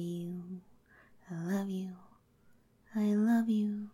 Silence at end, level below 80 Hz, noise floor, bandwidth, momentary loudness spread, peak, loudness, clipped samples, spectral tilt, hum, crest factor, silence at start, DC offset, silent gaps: 0.05 s; -76 dBFS; -66 dBFS; 14 kHz; 18 LU; -20 dBFS; -34 LUFS; under 0.1%; -7.5 dB/octave; none; 16 dB; 0 s; under 0.1%; none